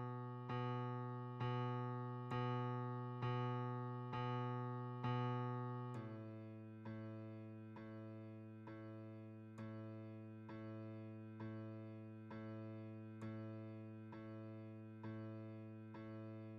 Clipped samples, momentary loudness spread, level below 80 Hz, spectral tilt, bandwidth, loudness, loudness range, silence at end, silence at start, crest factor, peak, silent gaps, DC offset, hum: under 0.1%; 11 LU; -80 dBFS; -7 dB/octave; 5.6 kHz; -49 LUFS; 9 LU; 0 s; 0 s; 18 dB; -30 dBFS; none; under 0.1%; none